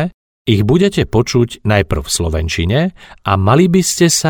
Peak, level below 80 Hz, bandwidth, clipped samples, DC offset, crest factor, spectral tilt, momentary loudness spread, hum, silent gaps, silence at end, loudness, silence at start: 0 dBFS; -30 dBFS; 19.5 kHz; under 0.1%; under 0.1%; 14 dB; -5 dB/octave; 7 LU; none; 0.14-0.45 s; 0 s; -14 LUFS; 0 s